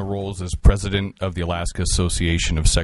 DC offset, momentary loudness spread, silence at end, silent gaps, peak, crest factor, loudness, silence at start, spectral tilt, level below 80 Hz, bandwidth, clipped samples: under 0.1%; 8 LU; 0 s; none; -2 dBFS; 18 dB; -22 LUFS; 0 s; -4.5 dB/octave; -22 dBFS; 11.5 kHz; under 0.1%